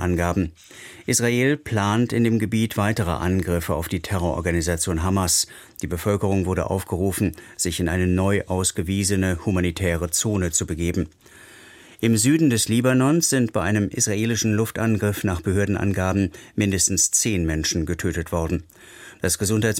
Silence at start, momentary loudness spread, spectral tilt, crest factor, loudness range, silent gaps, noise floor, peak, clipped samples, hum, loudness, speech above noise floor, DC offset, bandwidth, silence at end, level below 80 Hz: 0 s; 8 LU; -4.5 dB/octave; 16 dB; 3 LU; none; -46 dBFS; -6 dBFS; under 0.1%; none; -22 LUFS; 25 dB; under 0.1%; 16.5 kHz; 0 s; -40 dBFS